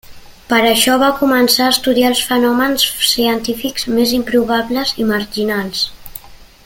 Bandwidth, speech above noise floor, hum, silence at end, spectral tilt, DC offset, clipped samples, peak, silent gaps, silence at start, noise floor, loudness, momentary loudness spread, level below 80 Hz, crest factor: 17 kHz; 22 dB; none; 0.25 s; -2.5 dB/octave; under 0.1%; under 0.1%; 0 dBFS; none; 0.1 s; -36 dBFS; -14 LUFS; 8 LU; -44 dBFS; 14 dB